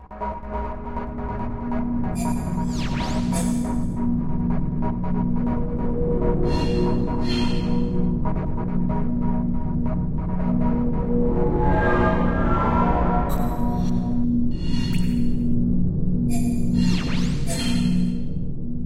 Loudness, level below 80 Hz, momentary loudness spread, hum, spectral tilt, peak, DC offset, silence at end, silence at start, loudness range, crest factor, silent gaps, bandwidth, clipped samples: -24 LUFS; -28 dBFS; 7 LU; none; -7 dB/octave; -6 dBFS; 0.4%; 0 s; 0 s; 3 LU; 14 dB; none; 12.5 kHz; under 0.1%